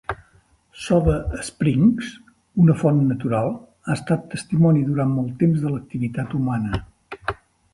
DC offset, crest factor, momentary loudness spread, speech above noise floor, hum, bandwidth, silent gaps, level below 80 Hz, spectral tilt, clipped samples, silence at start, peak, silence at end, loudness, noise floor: under 0.1%; 16 dB; 14 LU; 38 dB; none; 11.5 kHz; none; -38 dBFS; -7.5 dB/octave; under 0.1%; 0.1 s; -4 dBFS; 0.4 s; -21 LUFS; -57 dBFS